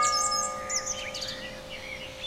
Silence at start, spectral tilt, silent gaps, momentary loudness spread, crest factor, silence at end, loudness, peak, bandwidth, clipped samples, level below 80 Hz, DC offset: 0 s; 0 dB/octave; none; 13 LU; 18 dB; 0 s; -30 LUFS; -14 dBFS; 16.5 kHz; under 0.1%; -54 dBFS; under 0.1%